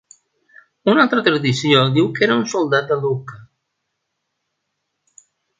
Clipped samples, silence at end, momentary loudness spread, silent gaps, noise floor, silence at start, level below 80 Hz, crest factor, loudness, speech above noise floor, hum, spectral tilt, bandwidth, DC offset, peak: under 0.1%; 2.15 s; 9 LU; none; -75 dBFS; 0.85 s; -62 dBFS; 20 dB; -17 LUFS; 59 dB; none; -5.5 dB/octave; 9.2 kHz; under 0.1%; 0 dBFS